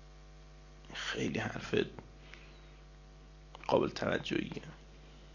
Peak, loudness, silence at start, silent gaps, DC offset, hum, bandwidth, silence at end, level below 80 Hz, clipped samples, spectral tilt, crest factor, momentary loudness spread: -14 dBFS; -36 LUFS; 0 s; none; under 0.1%; none; 7.4 kHz; 0 s; -56 dBFS; under 0.1%; -5 dB/octave; 26 dB; 24 LU